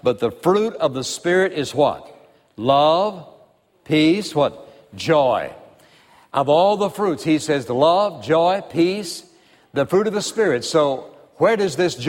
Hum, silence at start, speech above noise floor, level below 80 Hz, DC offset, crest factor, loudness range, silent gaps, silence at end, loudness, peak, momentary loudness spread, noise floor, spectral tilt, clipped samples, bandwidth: none; 0.05 s; 36 dB; -60 dBFS; under 0.1%; 18 dB; 2 LU; none; 0 s; -19 LUFS; -2 dBFS; 9 LU; -55 dBFS; -5 dB/octave; under 0.1%; 16.5 kHz